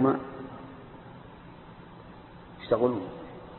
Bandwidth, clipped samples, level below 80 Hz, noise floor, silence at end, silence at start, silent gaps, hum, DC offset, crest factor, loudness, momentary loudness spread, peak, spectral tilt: 4.3 kHz; under 0.1%; -58 dBFS; -48 dBFS; 0 s; 0 s; none; none; under 0.1%; 22 dB; -30 LUFS; 22 LU; -10 dBFS; -11 dB/octave